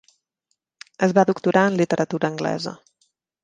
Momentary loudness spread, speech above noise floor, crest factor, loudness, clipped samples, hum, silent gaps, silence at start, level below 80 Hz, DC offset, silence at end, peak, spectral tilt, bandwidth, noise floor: 8 LU; 55 dB; 20 dB; -21 LUFS; under 0.1%; none; none; 1 s; -66 dBFS; under 0.1%; 0.7 s; -2 dBFS; -6 dB/octave; 9.4 kHz; -75 dBFS